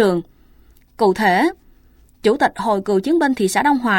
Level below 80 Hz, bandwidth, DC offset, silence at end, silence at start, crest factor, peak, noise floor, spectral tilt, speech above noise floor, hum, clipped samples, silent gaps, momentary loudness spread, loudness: -50 dBFS; 17 kHz; under 0.1%; 0 s; 0 s; 16 dB; -2 dBFS; -50 dBFS; -5 dB/octave; 34 dB; none; under 0.1%; none; 5 LU; -18 LUFS